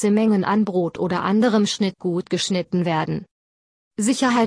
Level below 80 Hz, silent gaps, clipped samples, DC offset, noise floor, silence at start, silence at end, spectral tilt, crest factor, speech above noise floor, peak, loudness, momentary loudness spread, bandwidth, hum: -60 dBFS; 3.31-3.91 s; under 0.1%; under 0.1%; under -90 dBFS; 0 s; 0 s; -5 dB/octave; 14 dB; over 70 dB; -6 dBFS; -21 LUFS; 7 LU; 11 kHz; none